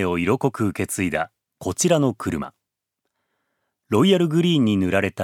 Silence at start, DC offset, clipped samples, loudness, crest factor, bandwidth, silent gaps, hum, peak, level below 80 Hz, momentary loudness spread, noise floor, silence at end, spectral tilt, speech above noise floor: 0 s; under 0.1%; under 0.1%; -21 LUFS; 18 dB; 16.5 kHz; none; none; -4 dBFS; -54 dBFS; 12 LU; -80 dBFS; 0 s; -5 dB/octave; 60 dB